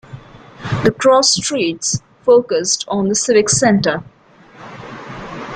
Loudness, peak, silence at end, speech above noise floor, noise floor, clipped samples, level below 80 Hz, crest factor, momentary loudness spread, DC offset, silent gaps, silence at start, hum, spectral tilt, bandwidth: -15 LUFS; -2 dBFS; 0 s; 29 dB; -43 dBFS; under 0.1%; -48 dBFS; 16 dB; 20 LU; under 0.1%; none; 0.1 s; none; -3.5 dB/octave; 10 kHz